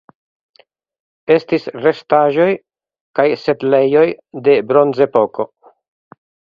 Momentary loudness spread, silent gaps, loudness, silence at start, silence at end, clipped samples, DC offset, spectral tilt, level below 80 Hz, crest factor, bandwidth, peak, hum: 11 LU; 3.01-3.14 s; -15 LUFS; 1.3 s; 1.05 s; under 0.1%; under 0.1%; -8 dB/octave; -62 dBFS; 16 dB; 6.4 kHz; 0 dBFS; none